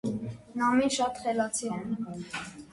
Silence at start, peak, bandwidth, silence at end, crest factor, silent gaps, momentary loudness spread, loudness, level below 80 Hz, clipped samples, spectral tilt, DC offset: 0.05 s; -14 dBFS; 11.5 kHz; 0.05 s; 16 dB; none; 12 LU; -30 LUFS; -62 dBFS; under 0.1%; -4 dB/octave; under 0.1%